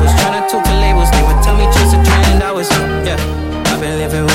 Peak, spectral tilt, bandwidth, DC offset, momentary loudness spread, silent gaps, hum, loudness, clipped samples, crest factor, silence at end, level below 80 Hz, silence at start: -2 dBFS; -5 dB/octave; 16.5 kHz; under 0.1%; 7 LU; none; none; -12 LUFS; under 0.1%; 10 dB; 0 s; -14 dBFS; 0 s